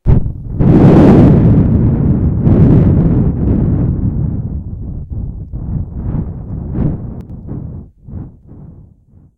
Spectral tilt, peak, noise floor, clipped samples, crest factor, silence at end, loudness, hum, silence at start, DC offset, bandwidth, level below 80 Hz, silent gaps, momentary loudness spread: -11.5 dB/octave; 0 dBFS; -44 dBFS; 0.4%; 12 dB; 0.65 s; -11 LUFS; none; 0.05 s; under 0.1%; 5.2 kHz; -20 dBFS; none; 21 LU